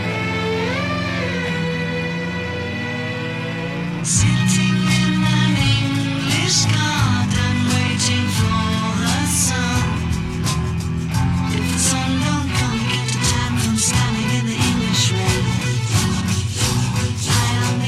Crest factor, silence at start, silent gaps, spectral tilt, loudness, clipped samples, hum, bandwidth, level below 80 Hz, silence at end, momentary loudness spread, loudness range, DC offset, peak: 14 dB; 0 s; none; -4 dB/octave; -19 LUFS; under 0.1%; none; 15 kHz; -36 dBFS; 0 s; 7 LU; 4 LU; 0.1%; -4 dBFS